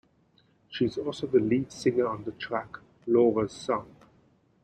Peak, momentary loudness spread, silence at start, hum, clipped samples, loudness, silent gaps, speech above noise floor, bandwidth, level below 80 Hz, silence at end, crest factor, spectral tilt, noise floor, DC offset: -10 dBFS; 12 LU; 0.7 s; none; under 0.1%; -28 LUFS; none; 38 dB; 9.4 kHz; -62 dBFS; 0.8 s; 18 dB; -6.5 dB/octave; -65 dBFS; under 0.1%